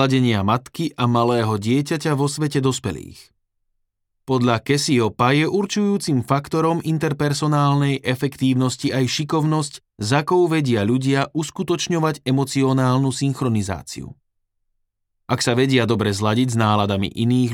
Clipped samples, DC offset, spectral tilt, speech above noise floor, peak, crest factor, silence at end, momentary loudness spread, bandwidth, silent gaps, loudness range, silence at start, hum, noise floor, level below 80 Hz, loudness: under 0.1%; under 0.1%; -5.5 dB/octave; 53 dB; -2 dBFS; 18 dB; 0 s; 6 LU; 16.5 kHz; none; 3 LU; 0 s; none; -72 dBFS; -54 dBFS; -20 LUFS